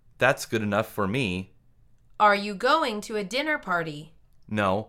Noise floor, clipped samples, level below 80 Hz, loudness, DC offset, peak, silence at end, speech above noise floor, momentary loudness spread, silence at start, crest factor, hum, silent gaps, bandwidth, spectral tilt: -57 dBFS; under 0.1%; -58 dBFS; -25 LUFS; under 0.1%; -6 dBFS; 0 s; 32 dB; 12 LU; 0.2 s; 20 dB; none; none; 16.5 kHz; -5 dB/octave